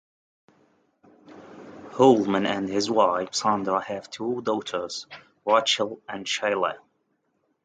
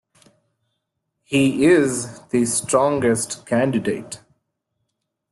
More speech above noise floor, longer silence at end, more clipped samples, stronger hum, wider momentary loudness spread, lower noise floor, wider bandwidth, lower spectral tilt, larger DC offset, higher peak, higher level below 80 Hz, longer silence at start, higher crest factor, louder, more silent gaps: second, 48 dB vs 57 dB; second, 0.9 s vs 1.15 s; neither; neither; first, 18 LU vs 12 LU; second, -72 dBFS vs -76 dBFS; second, 9.4 kHz vs 12.5 kHz; about the same, -4 dB/octave vs -4.5 dB/octave; neither; about the same, -6 dBFS vs -4 dBFS; second, -68 dBFS vs -58 dBFS; about the same, 1.3 s vs 1.3 s; about the same, 20 dB vs 18 dB; second, -24 LUFS vs -19 LUFS; neither